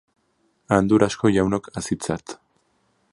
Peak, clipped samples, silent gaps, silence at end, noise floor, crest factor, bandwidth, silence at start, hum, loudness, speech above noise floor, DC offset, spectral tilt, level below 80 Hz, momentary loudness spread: -2 dBFS; under 0.1%; none; 0.8 s; -67 dBFS; 22 dB; 11.5 kHz; 0.7 s; none; -21 LUFS; 47 dB; under 0.1%; -6 dB/octave; -48 dBFS; 14 LU